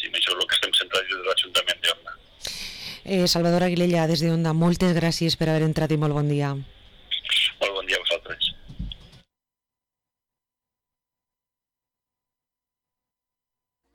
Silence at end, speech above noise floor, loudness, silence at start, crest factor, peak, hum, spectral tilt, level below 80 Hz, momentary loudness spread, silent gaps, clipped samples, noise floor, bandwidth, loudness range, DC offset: 5 s; 68 dB; -22 LUFS; 0 s; 12 dB; -12 dBFS; none; -4.5 dB/octave; -48 dBFS; 14 LU; none; under 0.1%; -89 dBFS; 18.5 kHz; 7 LU; under 0.1%